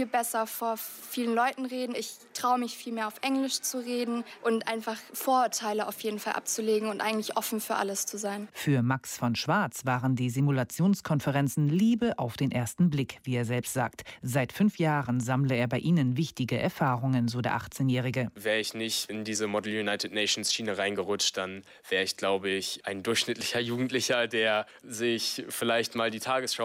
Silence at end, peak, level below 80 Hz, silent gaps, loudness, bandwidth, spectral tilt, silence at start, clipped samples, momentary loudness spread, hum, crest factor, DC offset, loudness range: 0 s; -12 dBFS; -66 dBFS; none; -29 LUFS; 16.5 kHz; -4.5 dB/octave; 0 s; under 0.1%; 7 LU; none; 18 dB; under 0.1%; 3 LU